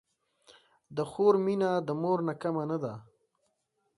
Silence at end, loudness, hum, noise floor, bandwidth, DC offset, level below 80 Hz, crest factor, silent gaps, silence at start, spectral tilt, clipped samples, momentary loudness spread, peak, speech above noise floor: 0.95 s; -30 LUFS; none; -78 dBFS; 11.5 kHz; under 0.1%; -74 dBFS; 20 dB; none; 0.9 s; -8 dB/octave; under 0.1%; 13 LU; -10 dBFS; 49 dB